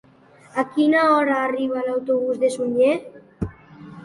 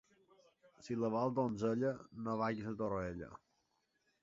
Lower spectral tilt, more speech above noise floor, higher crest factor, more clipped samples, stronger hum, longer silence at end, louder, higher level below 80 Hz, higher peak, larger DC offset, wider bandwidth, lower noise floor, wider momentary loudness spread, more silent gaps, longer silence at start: about the same, -6 dB/octave vs -7 dB/octave; second, 31 dB vs 43 dB; about the same, 16 dB vs 18 dB; neither; neither; second, 0 s vs 0.85 s; first, -20 LUFS vs -39 LUFS; first, -50 dBFS vs -66 dBFS; first, -6 dBFS vs -22 dBFS; neither; first, 11.5 kHz vs 7.6 kHz; second, -51 dBFS vs -81 dBFS; first, 15 LU vs 11 LU; neither; second, 0.55 s vs 0.8 s